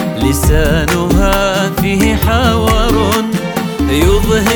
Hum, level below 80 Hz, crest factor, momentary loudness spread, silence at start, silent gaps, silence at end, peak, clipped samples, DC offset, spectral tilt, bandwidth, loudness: none; -18 dBFS; 10 dB; 3 LU; 0 s; none; 0 s; 0 dBFS; under 0.1%; under 0.1%; -5 dB/octave; over 20 kHz; -12 LUFS